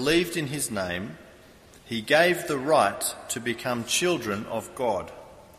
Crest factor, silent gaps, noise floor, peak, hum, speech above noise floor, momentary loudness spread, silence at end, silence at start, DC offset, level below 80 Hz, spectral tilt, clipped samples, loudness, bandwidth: 22 dB; none; -52 dBFS; -6 dBFS; none; 26 dB; 13 LU; 0.15 s; 0 s; under 0.1%; -56 dBFS; -3.5 dB/octave; under 0.1%; -26 LUFS; 15 kHz